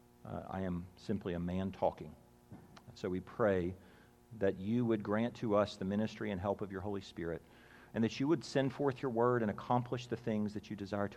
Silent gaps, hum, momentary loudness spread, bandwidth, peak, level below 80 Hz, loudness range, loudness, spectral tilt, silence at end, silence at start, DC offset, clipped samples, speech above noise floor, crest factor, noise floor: none; none; 11 LU; 13.5 kHz; -18 dBFS; -68 dBFS; 4 LU; -37 LUFS; -7 dB/octave; 0 s; 0.25 s; under 0.1%; under 0.1%; 21 dB; 20 dB; -57 dBFS